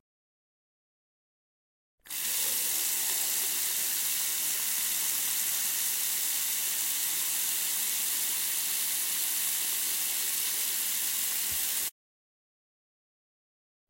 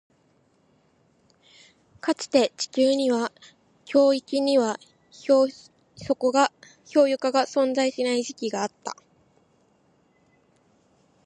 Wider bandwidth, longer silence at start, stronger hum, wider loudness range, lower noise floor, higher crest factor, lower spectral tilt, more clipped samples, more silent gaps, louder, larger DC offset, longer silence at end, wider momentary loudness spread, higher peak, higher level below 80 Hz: first, 16.5 kHz vs 11 kHz; about the same, 2.05 s vs 2.05 s; neither; about the same, 3 LU vs 5 LU; first, under -90 dBFS vs -64 dBFS; about the same, 18 dB vs 20 dB; second, 2.5 dB/octave vs -3.5 dB/octave; neither; neither; second, -27 LUFS vs -23 LUFS; neither; second, 2 s vs 2.3 s; second, 1 LU vs 12 LU; second, -14 dBFS vs -6 dBFS; about the same, -72 dBFS vs -72 dBFS